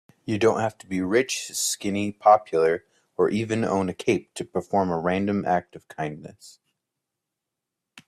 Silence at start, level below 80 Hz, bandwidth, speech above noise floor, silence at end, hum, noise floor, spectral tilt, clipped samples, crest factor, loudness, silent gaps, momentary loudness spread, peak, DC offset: 0.25 s; -64 dBFS; 15.5 kHz; 61 dB; 0.05 s; none; -85 dBFS; -4.5 dB/octave; under 0.1%; 20 dB; -24 LUFS; none; 13 LU; -4 dBFS; under 0.1%